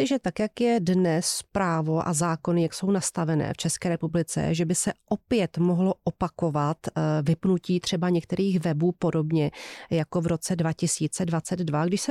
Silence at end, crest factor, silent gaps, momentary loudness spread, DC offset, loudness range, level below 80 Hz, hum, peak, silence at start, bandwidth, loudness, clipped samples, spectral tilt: 0 s; 12 dB; none; 4 LU; under 0.1%; 1 LU; -56 dBFS; none; -12 dBFS; 0 s; 14 kHz; -26 LUFS; under 0.1%; -5.5 dB/octave